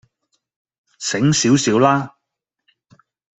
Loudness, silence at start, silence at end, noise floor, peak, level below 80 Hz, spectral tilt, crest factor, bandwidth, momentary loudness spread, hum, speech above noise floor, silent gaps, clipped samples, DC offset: -16 LUFS; 1 s; 1.3 s; -79 dBFS; -2 dBFS; -58 dBFS; -4.5 dB/octave; 18 dB; 8.4 kHz; 12 LU; none; 64 dB; none; under 0.1%; under 0.1%